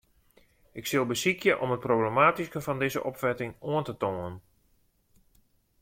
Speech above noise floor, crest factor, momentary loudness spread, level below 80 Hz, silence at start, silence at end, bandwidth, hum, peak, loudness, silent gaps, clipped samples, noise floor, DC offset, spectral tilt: 40 dB; 22 dB; 14 LU; -64 dBFS; 0.75 s; 1.45 s; 16.5 kHz; none; -8 dBFS; -28 LUFS; none; under 0.1%; -68 dBFS; under 0.1%; -5 dB/octave